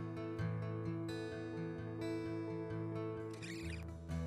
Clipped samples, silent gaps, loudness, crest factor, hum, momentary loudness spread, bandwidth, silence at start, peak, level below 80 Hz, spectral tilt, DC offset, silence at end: under 0.1%; none; -44 LUFS; 14 dB; none; 4 LU; 12.5 kHz; 0 s; -28 dBFS; -62 dBFS; -7.5 dB/octave; under 0.1%; 0 s